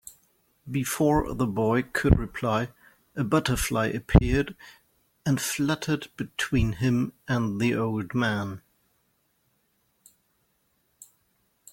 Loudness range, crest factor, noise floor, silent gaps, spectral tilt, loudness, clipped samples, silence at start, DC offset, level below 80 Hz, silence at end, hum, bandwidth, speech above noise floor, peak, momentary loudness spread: 6 LU; 26 dB; -71 dBFS; none; -5.5 dB/octave; -26 LUFS; under 0.1%; 0.05 s; under 0.1%; -38 dBFS; 3.15 s; none; 16.5 kHz; 46 dB; -2 dBFS; 11 LU